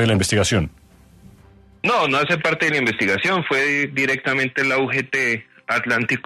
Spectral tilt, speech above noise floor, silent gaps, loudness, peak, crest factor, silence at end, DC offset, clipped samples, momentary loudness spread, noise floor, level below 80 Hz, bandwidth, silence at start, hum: -4.5 dB/octave; 29 dB; none; -19 LUFS; -6 dBFS; 14 dB; 0.05 s; under 0.1%; under 0.1%; 5 LU; -49 dBFS; -48 dBFS; 13.5 kHz; 0 s; none